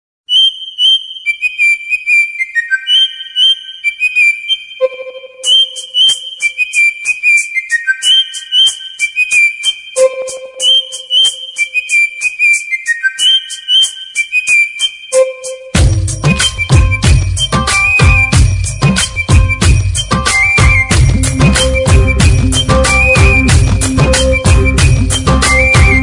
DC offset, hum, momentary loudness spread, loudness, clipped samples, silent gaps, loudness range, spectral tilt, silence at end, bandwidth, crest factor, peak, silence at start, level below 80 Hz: under 0.1%; none; 6 LU; -9 LUFS; under 0.1%; none; 2 LU; -3 dB/octave; 0 s; 11 kHz; 10 dB; 0 dBFS; 0.3 s; -18 dBFS